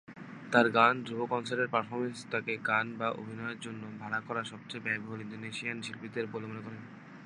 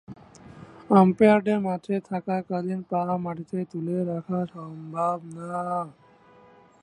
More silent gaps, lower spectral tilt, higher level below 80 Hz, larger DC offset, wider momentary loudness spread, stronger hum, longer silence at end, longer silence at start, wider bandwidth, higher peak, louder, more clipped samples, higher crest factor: neither; second, -5 dB/octave vs -8.5 dB/octave; second, -78 dBFS vs -66 dBFS; neither; about the same, 16 LU vs 14 LU; neither; second, 0 s vs 0.9 s; about the same, 0.1 s vs 0.1 s; about the same, 11 kHz vs 10.5 kHz; second, -8 dBFS vs -4 dBFS; second, -33 LUFS vs -25 LUFS; neither; about the same, 26 dB vs 22 dB